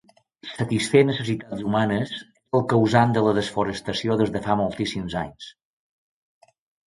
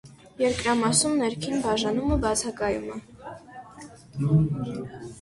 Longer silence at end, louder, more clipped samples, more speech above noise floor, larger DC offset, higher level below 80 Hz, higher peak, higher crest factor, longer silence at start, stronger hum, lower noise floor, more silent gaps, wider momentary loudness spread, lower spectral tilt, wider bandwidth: first, 1.35 s vs 0 s; about the same, -23 LUFS vs -25 LUFS; neither; about the same, 21 dB vs 21 dB; neither; second, -52 dBFS vs -42 dBFS; first, -4 dBFS vs -8 dBFS; about the same, 20 dB vs 20 dB; first, 0.45 s vs 0.05 s; neither; about the same, -43 dBFS vs -46 dBFS; neither; second, 15 LU vs 22 LU; first, -6 dB/octave vs -4.5 dB/octave; about the same, 11.5 kHz vs 11.5 kHz